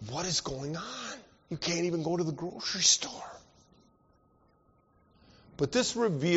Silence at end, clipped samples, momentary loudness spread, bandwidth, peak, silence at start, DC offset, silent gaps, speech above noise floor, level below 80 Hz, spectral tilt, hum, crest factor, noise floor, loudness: 0 s; under 0.1%; 18 LU; 8 kHz; -10 dBFS; 0 s; under 0.1%; none; 36 dB; -62 dBFS; -3.5 dB/octave; none; 24 dB; -67 dBFS; -30 LUFS